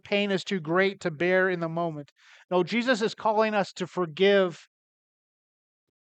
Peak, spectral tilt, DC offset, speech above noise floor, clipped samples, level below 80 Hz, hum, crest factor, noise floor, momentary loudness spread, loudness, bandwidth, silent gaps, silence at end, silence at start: -10 dBFS; -5.5 dB/octave; under 0.1%; over 64 dB; under 0.1%; -80 dBFS; none; 18 dB; under -90 dBFS; 9 LU; -26 LUFS; 8.8 kHz; 2.12-2.16 s, 2.45-2.49 s; 1.45 s; 0.05 s